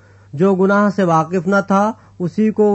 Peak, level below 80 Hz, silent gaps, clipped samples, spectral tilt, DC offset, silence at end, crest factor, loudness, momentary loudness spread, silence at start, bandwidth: -2 dBFS; -58 dBFS; none; under 0.1%; -8 dB/octave; under 0.1%; 0 s; 12 dB; -16 LUFS; 9 LU; 0.35 s; 8.2 kHz